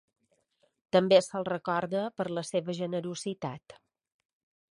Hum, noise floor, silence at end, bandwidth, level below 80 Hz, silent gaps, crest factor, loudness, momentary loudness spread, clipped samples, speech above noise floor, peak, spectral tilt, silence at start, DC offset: none; -73 dBFS; 0.95 s; 11.5 kHz; -74 dBFS; none; 22 dB; -30 LUFS; 13 LU; under 0.1%; 44 dB; -10 dBFS; -5 dB/octave; 0.95 s; under 0.1%